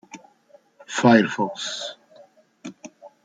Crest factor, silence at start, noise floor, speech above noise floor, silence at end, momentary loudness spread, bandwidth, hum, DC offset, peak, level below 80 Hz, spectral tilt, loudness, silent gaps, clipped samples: 22 dB; 0.15 s; -56 dBFS; 36 dB; 0.15 s; 26 LU; 9.2 kHz; none; under 0.1%; -2 dBFS; -68 dBFS; -5 dB/octave; -21 LUFS; none; under 0.1%